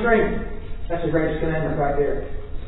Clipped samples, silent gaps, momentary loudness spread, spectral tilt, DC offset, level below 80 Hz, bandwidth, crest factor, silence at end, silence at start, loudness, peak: under 0.1%; none; 13 LU; -11.5 dB/octave; under 0.1%; -30 dBFS; 4.1 kHz; 16 dB; 0 s; 0 s; -23 LUFS; -6 dBFS